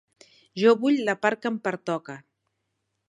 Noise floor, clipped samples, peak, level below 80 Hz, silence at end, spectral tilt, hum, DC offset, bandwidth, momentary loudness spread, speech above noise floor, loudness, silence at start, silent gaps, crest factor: -78 dBFS; under 0.1%; -6 dBFS; -80 dBFS; 0.9 s; -5.5 dB/octave; none; under 0.1%; 10.5 kHz; 20 LU; 54 dB; -24 LUFS; 0.55 s; none; 20 dB